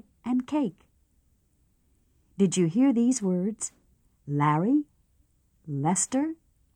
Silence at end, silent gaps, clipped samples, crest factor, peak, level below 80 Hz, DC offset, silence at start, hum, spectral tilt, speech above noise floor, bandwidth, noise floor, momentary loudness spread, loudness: 0.4 s; none; under 0.1%; 18 dB; -10 dBFS; -66 dBFS; under 0.1%; 0.25 s; none; -5.5 dB/octave; 43 dB; 10.5 kHz; -68 dBFS; 13 LU; -26 LUFS